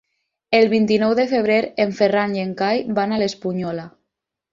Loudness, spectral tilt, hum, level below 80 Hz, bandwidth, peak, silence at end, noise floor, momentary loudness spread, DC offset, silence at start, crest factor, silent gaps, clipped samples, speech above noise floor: -19 LUFS; -6 dB/octave; none; -60 dBFS; 7.4 kHz; -2 dBFS; 0.65 s; -80 dBFS; 9 LU; under 0.1%; 0.5 s; 18 dB; none; under 0.1%; 62 dB